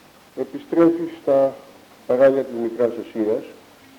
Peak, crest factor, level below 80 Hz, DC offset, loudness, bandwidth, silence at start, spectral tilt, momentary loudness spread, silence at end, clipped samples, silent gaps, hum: -4 dBFS; 16 dB; -66 dBFS; under 0.1%; -20 LUFS; 18 kHz; 0.35 s; -7.5 dB/octave; 14 LU; 0.45 s; under 0.1%; none; none